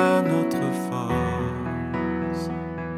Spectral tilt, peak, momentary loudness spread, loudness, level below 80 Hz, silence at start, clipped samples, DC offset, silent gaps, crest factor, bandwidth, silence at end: -7 dB/octave; -6 dBFS; 7 LU; -26 LUFS; -44 dBFS; 0 s; under 0.1%; under 0.1%; none; 18 dB; 15.5 kHz; 0 s